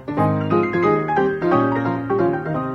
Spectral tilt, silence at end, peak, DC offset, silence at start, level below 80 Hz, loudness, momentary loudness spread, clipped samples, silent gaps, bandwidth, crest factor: -9 dB/octave; 0 s; -4 dBFS; under 0.1%; 0 s; -50 dBFS; -19 LUFS; 3 LU; under 0.1%; none; 6.6 kHz; 14 dB